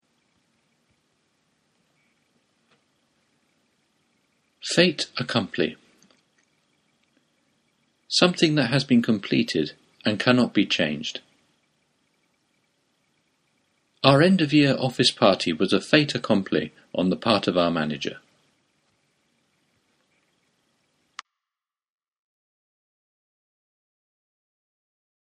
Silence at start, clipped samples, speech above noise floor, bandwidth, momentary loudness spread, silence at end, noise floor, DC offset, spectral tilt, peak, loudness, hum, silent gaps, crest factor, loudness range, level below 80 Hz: 4.65 s; under 0.1%; over 69 dB; 11.5 kHz; 13 LU; 7.05 s; under -90 dBFS; under 0.1%; -5 dB/octave; 0 dBFS; -22 LUFS; none; none; 26 dB; 10 LU; -64 dBFS